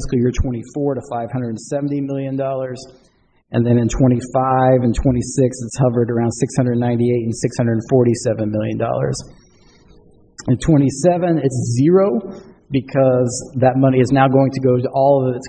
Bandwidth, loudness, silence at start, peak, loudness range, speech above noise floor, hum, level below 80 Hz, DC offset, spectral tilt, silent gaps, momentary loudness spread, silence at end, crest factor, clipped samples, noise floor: 9.4 kHz; -17 LUFS; 0 s; -2 dBFS; 4 LU; 33 dB; none; -36 dBFS; under 0.1%; -7 dB/octave; none; 9 LU; 0 s; 16 dB; under 0.1%; -49 dBFS